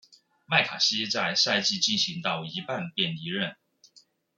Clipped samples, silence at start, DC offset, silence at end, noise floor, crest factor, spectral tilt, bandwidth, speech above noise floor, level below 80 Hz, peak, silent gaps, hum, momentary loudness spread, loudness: under 0.1%; 0.5 s; under 0.1%; 0.85 s; -61 dBFS; 22 dB; -2.5 dB/octave; 12 kHz; 33 dB; -76 dBFS; -6 dBFS; none; none; 10 LU; -26 LUFS